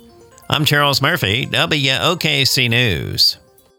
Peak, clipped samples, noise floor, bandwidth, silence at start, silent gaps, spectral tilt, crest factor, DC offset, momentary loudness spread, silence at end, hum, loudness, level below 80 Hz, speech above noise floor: -2 dBFS; under 0.1%; -43 dBFS; 19.5 kHz; 0.5 s; none; -3.5 dB/octave; 16 dB; under 0.1%; 4 LU; 0.45 s; none; -15 LUFS; -44 dBFS; 27 dB